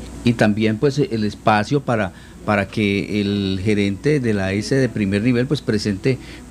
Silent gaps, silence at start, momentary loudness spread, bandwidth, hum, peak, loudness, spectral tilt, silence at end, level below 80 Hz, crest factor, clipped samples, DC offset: none; 0 s; 5 LU; 12.5 kHz; none; 0 dBFS; -19 LUFS; -6.5 dB/octave; 0 s; -44 dBFS; 18 dB; under 0.1%; under 0.1%